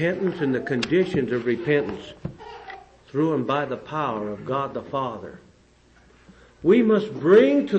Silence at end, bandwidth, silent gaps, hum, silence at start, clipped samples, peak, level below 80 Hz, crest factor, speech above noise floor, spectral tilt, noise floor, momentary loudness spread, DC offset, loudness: 0 s; 8.6 kHz; none; none; 0 s; under 0.1%; -6 dBFS; -56 dBFS; 18 dB; 34 dB; -7.5 dB/octave; -56 dBFS; 20 LU; under 0.1%; -23 LUFS